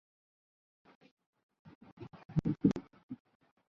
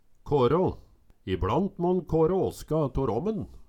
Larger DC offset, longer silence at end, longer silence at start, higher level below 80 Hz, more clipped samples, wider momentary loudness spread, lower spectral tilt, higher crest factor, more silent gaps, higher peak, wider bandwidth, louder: neither; first, 0.55 s vs 0.05 s; first, 1.65 s vs 0.25 s; second, -62 dBFS vs -44 dBFS; neither; first, 21 LU vs 8 LU; first, -9.5 dB/octave vs -8 dB/octave; first, 26 dB vs 14 dB; first, 1.75-1.81 s, 1.92-1.97 s, 2.25-2.29 s, 3.03-3.09 s vs none; about the same, -14 dBFS vs -12 dBFS; second, 6.8 kHz vs 17 kHz; second, -35 LUFS vs -27 LUFS